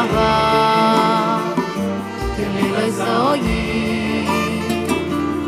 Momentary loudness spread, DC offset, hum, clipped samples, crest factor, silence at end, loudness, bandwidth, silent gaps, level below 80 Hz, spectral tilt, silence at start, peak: 8 LU; under 0.1%; none; under 0.1%; 16 dB; 0 s; -18 LUFS; 16 kHz; none; -34 dBFS; -5.5 dB/octave; 0 s; -2 dBFS